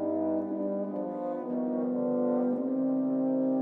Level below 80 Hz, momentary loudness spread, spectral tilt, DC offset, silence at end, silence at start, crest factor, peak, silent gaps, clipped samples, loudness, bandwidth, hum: -82 dBFS; 6 LU; -12 dB/octave; under 0.1%; 0 s; 0 s; 12 dB; -18 dBFS; none; under 0.1%; -30 LUFS; 2.4 kHz; none